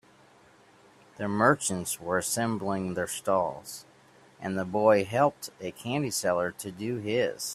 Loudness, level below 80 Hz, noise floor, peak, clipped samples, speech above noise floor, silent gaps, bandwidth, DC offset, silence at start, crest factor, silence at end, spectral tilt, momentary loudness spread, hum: -28 LUFS; -66 dBFS; -58 dBFS; -6 dBFS; under 0.1%; 30 dB; none; 15.5 kHz; under 0.1%; 1.2 s; 22 dB; 0 s; -4.5 dB/octave; 14 LU; none